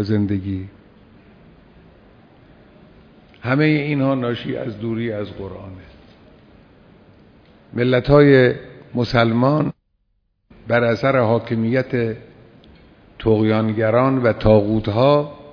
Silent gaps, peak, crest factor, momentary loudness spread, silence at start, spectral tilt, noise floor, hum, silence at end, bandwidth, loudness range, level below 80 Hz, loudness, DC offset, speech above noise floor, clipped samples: none; 0 dBFS; 20 dB; 16 LU; 0 s; -9 dB/octave; -67 dBFS; none; 0 s; 5.4 kHz; 11 LU; -44 dBFS; -18 LUFS; under 0.1%; 50 dB; under 0.1%